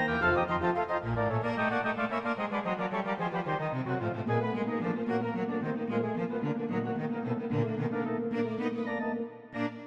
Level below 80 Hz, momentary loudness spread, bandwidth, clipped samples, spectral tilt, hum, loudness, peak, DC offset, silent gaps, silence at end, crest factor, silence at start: -58 dBFS; 4 LU; 7.6 kHz; under 0.1%; -8.5 dB/octave; none; -32 LUFS; -14 dBFS; under 0.1%; none; 0 s; 16 dB; 0 s